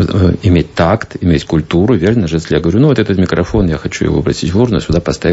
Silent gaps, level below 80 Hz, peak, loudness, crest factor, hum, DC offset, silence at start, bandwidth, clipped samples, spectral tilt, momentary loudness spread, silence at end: none; -28 dBFS; 0 dBFS; -12 LUFS; 12 dB; none; under 0.1%; 0 s; 8 kHz; under 0.1%; -7 dB/octave; 4 LU; 0 s